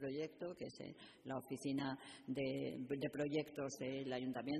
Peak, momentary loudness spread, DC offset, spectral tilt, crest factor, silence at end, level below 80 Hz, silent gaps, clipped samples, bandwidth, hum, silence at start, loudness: -28 dBFS; 9 LU; under 0.1%; -5.5 dB/octave; 16 dB; 0 s; -78 dBFS; none; under 0.1%; 13.5 kHz; none; 0 s; -45 LUFS